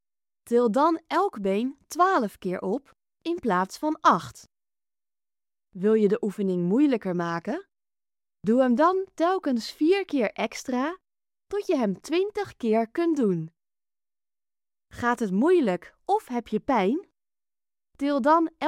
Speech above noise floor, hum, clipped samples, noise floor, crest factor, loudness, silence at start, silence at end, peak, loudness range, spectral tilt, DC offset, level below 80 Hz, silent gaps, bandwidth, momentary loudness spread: over 66 dB; none; under 0.1%; under -90 dBFS; 20 dB; -25 LUFS; 0.45 s; 0 s; -6 dBFS; 3 LU; -6.5 dB/octave; under 0.1%; -66 dBFS; none; 15.5 kHz; 10 LU